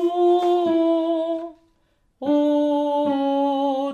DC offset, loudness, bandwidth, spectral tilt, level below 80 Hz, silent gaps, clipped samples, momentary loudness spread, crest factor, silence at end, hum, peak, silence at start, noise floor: under 0.1%; -21 LUFS; 7.2 kHz; -6 dB/octave; -68 dBFS; none; under 0.1%; 8 LU; 12 dB; 0 s; none; -10 dBFS; 0 s; -64 dBFS